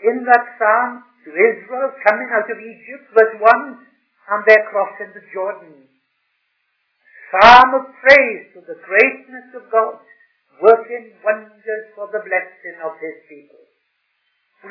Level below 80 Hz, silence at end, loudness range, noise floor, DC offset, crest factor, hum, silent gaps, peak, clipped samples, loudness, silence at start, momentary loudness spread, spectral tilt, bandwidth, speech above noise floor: -54 dBFS; 1.55 s; 8 LU; -68 dBFS; under 0.1%; 16 dB; none; none; 0 dBFS; 0.5%; -14 LUFS; 0 s; 22 LU; -4 dB/octave; 5.4 kHz; 53 dB